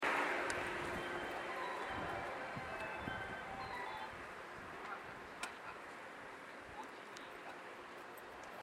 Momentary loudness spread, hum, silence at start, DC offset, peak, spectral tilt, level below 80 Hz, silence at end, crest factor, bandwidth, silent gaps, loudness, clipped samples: 11 LU; none; 0 s; under 0.1%; -22 dBFS; -3.5 dB/octave; -68 dBFS; 0 s; 22 dB; 16 kHz; none; -45 LUFS; under 0.1%